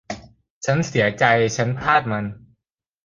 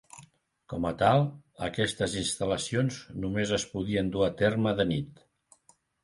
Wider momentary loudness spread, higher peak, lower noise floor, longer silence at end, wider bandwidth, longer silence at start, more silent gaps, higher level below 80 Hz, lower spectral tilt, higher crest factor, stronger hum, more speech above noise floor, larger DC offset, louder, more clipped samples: first, 15 LU vs 10 LU; first, -2 dBFS vs -10 dBFS; first, -73 dBFS vs -65 dBFS; second, 0.65 s vs 0.95 s; second, 9.4 kHz vs 11.5 kHz; about the same, 0.1 s vs 0.15 s; first, 0.50-0.61 s vs none; about the same, -52 dBFS vs -52 dBFS; about the same, -5 dB/octave vs -5 dB/octave; about the same, 20 dB vs 20 dB; neither; first, 53 dB vs 36 dB; neither; first, -20 LUFS vs -29 LUFS; neither